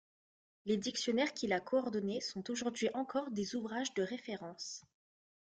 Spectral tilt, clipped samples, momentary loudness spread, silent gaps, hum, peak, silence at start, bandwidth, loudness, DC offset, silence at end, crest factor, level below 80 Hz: -4 dB/octave; under 0.1%; 10 LU; none; none; -22 dBFS; 0.65 s; 9.6 kHz; -38 LUFS; under 0.1%; 0.75 s; 18 dB; -78 dBFS